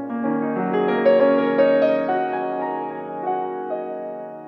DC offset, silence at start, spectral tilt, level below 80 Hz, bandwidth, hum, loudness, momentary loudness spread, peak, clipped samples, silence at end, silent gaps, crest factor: under 0.1%; 0 s; -9 dB/octave; -78 dBFS; 5.4 kHz; none; -21 LUFS; 12 LU; -6 dBFS; under 0.1%; 0 s; none; 16 dB